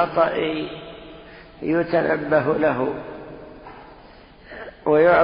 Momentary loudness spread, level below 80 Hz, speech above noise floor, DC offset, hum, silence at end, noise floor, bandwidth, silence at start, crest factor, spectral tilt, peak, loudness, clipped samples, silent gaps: 22 LU; -52 dBFS; 27 dB; under 0.1%; none; 0 s; -46 dBFS; 5.2 kHz; 0 s; 18 dB; -11 dB/octave; -4 dBFS; -21 LUFS; under 0.1%; none